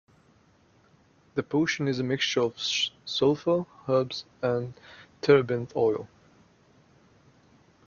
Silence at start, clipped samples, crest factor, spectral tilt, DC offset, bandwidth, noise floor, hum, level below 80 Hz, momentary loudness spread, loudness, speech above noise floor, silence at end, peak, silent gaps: 1.35 s; under 0.1%; 24 dB; -5 dB/octave; under 0.1%; 7.2 kHz; -62 dBFS; none; -66 dBFS; 12 LU; -27 LUFS; 35 dB; 1.8 s; -6 dBFS; none